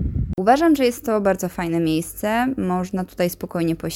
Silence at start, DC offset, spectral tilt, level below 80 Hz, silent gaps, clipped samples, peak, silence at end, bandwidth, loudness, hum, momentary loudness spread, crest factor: 0 s; under 0.1%; -6 dB/octave; -36 dBFS; none; under 0.1%; -2 dBFS; 0 s; 17 kHz; -21 LUFS; none; 8 LU; 18 dB